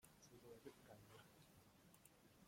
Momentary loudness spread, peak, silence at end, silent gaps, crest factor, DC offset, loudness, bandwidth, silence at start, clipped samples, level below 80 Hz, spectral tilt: 6 LU; -48 dBFS; 0 s; none; 20 dB; under 0.1%; -66 LUFS; 16.5 kHz; 0 s; under 0.1%; -84 dBFS; -4.5 dB/octave